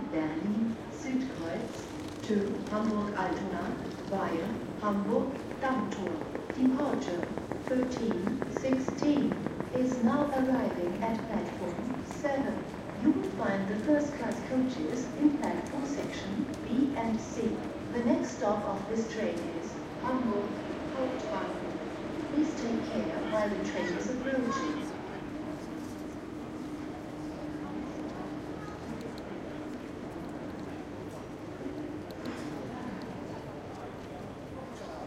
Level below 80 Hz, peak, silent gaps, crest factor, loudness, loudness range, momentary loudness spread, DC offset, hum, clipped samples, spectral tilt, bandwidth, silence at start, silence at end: -58 dBFS; -14 dBFS; none; 20 dB; -34 LUFS; 9 LU; 12 LU; under 0.1%; none; under 0.1%; -6 dB/octave; 14 kHz; 0 s; 0 s